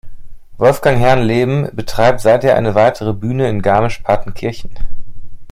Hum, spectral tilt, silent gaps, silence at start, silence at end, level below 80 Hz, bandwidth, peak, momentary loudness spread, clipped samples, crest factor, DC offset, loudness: none; -6.5 dB/octave; none; 0.05 s; 0 s; -30 dBFS; 15 kHz; 0 dBFS; 12 LU; under 0.1%; 12 dB; under 0.1%; -14 LUFS